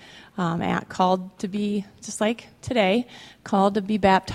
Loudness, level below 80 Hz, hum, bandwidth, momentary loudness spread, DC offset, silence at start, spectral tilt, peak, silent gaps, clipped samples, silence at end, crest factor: -24 LUFS; -54 dBFS; none; 12.5 kHz; 12 LU; under 0.1%; 0 s; -5.5 dB/octave; -4 dBFS; none; under 0.1%; 0 s; 20 dB